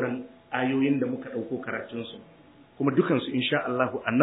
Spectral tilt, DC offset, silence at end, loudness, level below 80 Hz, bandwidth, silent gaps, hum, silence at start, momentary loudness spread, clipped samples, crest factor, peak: -10 dB/octave; under 0.1%; 0 s; -28 LUFS; -72 dBFS; 4 kHz; none; none; 0 s; 12 LU; under 0.1%; 22 dB; -6 dBFS